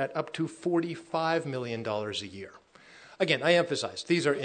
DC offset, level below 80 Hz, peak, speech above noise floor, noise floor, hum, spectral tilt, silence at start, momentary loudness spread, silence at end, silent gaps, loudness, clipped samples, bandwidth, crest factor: under 0.1%; -76 dBFS; -10 dBFS; 25 dB; -54 dBFS; none; -5 dB/octave; 0 s; 11 LU; 0 s; none; -29 LUFS; under 0.1%; 9.4 kHz; 20 dB